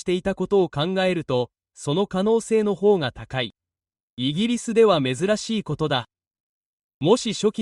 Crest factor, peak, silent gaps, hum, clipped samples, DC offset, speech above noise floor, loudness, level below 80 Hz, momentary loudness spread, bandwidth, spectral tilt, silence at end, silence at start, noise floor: 18 dB; -4 dBFS; 4.03-4.17 s, 6.27-6.31 s, 6.40-7.01 s; none; under 0.1%; under 0.1%; over 68 dB; -22 LUFS; -54 dBFS; 9 LU; 11.5 kHz; -5.5 dB/octave; 0 s; 0.05 s; under -90 dBFS